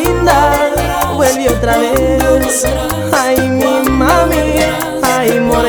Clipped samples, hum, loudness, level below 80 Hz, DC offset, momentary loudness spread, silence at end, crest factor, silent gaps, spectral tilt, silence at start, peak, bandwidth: under 0.1%; none; -12 LUFS; -24 dBFS; under 0.1%; 4 LU; 0 s; 10 dB; none; -4.5 dB/octave; 0 s; 0 dBFS; over 20 kHz